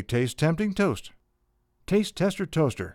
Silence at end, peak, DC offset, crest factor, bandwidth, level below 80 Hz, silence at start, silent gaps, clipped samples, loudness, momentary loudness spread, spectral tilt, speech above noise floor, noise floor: 0 s; -8 dBFS; under 0.1%; 18 dB; 16 kHz; -52 dBFS; 0 s; none; under 0.1%; -26 LUFS; 3 LU; -6 dB/octave; 45 dB; -71 dBFS